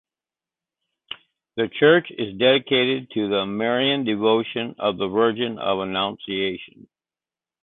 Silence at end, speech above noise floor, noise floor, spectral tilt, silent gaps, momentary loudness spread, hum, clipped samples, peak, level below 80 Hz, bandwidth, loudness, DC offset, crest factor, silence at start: 0.95 s; over 69 dB; under -90 dBFS; -9.5 dB/octave; none; 14 LU; none; under 0.1%; -4 dBFS; -62 dBFS; 4.2 kHz; -21 LUFS; under 0.1%; 18 dB; 1.1 s